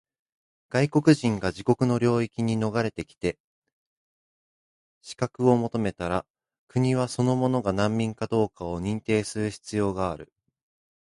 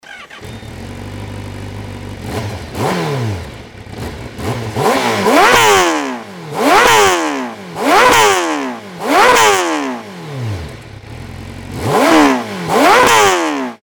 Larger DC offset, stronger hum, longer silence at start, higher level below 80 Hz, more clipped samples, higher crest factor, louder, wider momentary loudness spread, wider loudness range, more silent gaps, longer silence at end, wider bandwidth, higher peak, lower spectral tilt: neither; neither; first, 0.7 s vs 0.05 s; second, -52 dBFS vs -40 dBFS; second, under 0.1% vs 0.2%; first, 20 dB vs 14 dB; second, -26 LUFS vs -12 LUFS; second, 9 LU vs 22 LU; second, 5 LU vs 12 LU; first, 3.40-3.62 s, 3.73-5.01 s, 6.30-6.34 s, 6.58-6.67 s vs none; first, 0.85 s vs 0.05 s; second, 11.5 kHz vs over 20 kHz; second, -6 dBFS vs 0 dBFS; first, -6.5 dB/octave vs -3.5 dB/octave